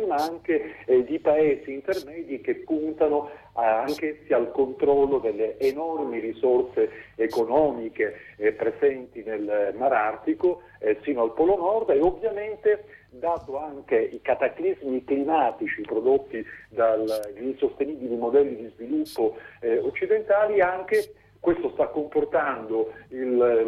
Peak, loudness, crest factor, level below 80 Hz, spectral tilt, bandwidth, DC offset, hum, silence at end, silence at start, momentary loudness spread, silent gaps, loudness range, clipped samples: -10 dBFS; -25 LUFS; 16 dB; -58 dBFS; -6.5 dB/octave; 13.5 kHz; under 0.1%; none; 0 s; 0 s; 8 LU; none; 2 LU; under 0.1%